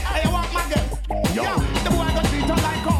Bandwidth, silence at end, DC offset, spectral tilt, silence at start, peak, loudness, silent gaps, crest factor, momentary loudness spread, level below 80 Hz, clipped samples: 16 kHz; 0 s; under 0.1%; -5 dB/octave; 0 s; -8 dBFS; -22 LUFS; none; 12 dB; 3 LU; -26 dBFS; under 0.1%